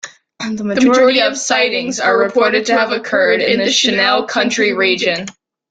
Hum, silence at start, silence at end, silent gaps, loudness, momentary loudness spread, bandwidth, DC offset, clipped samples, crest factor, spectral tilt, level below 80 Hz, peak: none; 0.05 s; 0.4 s; none; -13 LUFS; 10 LU; 9.4 kHz; under 0.1%; under 0.1%; 14 dB; -2.5 dB/octave; -58 dBFS; 0 dBFS